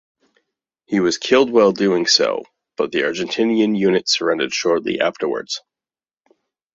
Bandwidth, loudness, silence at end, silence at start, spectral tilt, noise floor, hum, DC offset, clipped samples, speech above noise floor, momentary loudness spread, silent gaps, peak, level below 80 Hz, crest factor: 8 kHz; -18 LUFS; 1.15 s; 0.9 s; -3.5 dB/octave; under -90 dBFS; none; under 0.1%; under 0.1%; over 73 dB; 11 LU; none; 0 dBFS; -62 dBFS; 18 dB